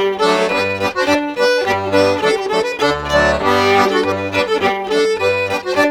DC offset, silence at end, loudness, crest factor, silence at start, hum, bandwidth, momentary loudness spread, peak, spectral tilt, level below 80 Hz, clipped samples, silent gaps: under 0.1%; 0 s; -15 LUFS; 14 dB; 0 s; none; 17.5 kHz; 4 LU; 0 dBFS; -4 dB/octave; -40 dBFS; under 0.1%; none